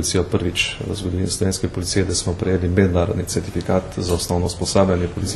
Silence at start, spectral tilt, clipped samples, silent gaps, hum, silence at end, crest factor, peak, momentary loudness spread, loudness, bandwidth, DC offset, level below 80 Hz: 0 s; -5 dB/octave; under 0.1%; none; none; 0 s; 18 dB; -2 dBFS; 6 LU; -20 LUFS; 13 kHz; under 0.1%; -36 dBFS